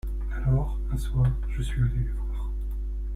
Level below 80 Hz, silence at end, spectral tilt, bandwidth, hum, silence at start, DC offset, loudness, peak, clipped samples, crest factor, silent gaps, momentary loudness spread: -28 dBFS; 0 s; -8 dB/octave; 12.5 kHz; none; 0.05 s; under 0.1%; -29 LUFS; -14 dBFS; under 0.1%; 14 dB; none; 8 LU